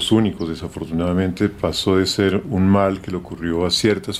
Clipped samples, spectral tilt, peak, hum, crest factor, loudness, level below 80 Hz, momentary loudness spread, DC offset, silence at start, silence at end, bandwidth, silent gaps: under 0.1%; -5.5 dB/octave; -4 dBFS; none; 16 dB; -20 LUFS; -44 dBFS; 10 LU; under 0.1%; 0 s; 0 s; 16 kHz; none